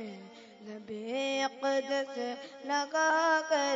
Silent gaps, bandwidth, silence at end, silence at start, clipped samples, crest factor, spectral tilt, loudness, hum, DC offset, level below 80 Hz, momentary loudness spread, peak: none; 7.8 kHz; 0 s; 0 s; under 0.1%; 16 dB; -2 dB/octave; -31 LUFS; none; under 0.1%; -86 dBFS; 20 LU; -18 dBFS